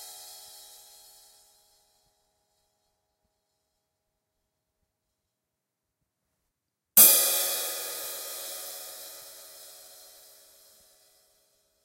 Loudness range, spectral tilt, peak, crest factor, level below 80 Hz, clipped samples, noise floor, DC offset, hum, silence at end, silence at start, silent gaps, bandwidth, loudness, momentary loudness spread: 19 LU; 1.5 dB/octave; -2 dBFS; 30 dB; -78 dBFS; under 0.1%; -85 dBFS; under 0.1%; none; 2.15 s; 0 s; none; 16 kHz; -21 LUFS; 30 LU